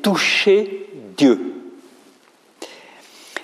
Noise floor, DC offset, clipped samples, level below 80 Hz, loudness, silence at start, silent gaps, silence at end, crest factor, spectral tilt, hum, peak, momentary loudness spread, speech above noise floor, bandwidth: -53 dBFS; under 0.1%; under 0.1%; -72 dBFS; -16 LUFS; 0 s; none; 0 s; 18 dB; -4 dB/octave; none; -2 dBFS; 23 LU; 38 dB; 14.5 kHz